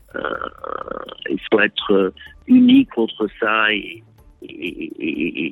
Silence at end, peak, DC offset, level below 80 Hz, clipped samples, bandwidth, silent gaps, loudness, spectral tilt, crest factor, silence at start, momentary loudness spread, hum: 0 s; -2 dBFS; under 0.1%; -52 dBFS; under 0.1%; 4 kHz; none; -18 LUFS; -7 dB/octave; 16 dB; 0.15 s; 17 LU; none